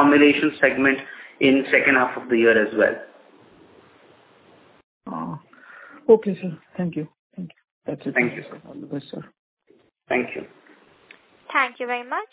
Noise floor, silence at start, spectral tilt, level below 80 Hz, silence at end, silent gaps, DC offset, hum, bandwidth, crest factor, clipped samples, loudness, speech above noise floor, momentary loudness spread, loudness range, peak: -60 dBFS; 0 s; -9 dB/octave; -64 dBFS; 0.05 s; 4.83-5.01 s, 7.19-7.30 s, 7.71-7.82 s, 9.39-9.57 s; under 0.1%; none; 4 kHz; 22 dB; under 0.1%; -20 LUFS; 39 dB; 22 LU; 11 LU; -2 dBFS